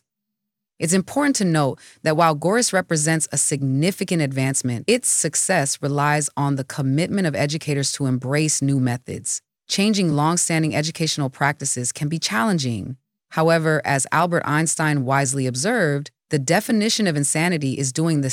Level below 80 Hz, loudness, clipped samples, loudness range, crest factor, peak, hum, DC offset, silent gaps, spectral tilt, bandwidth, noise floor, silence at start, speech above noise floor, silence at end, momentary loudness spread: -66 dBFS; -20 LUFS; under 0.1%; 2 LU; 18 dB; -4 dBFS; none; under 0.1%; none; -4 dB/octave; 16.5 kHz; -82 dBFS; 0.8 s; 61 dB; 0 s; 6 LU